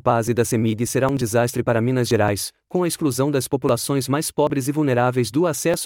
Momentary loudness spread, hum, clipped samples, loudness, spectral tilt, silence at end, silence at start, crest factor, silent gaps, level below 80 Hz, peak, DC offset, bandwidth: 2 LU; none; under 0.1%; -21 LUFS; -5.5 dB/octave; 0 s; 0.05 s; 16 dB; none; -54 dBFS; -4 dBFS; under 0.1%; 18.5 kHz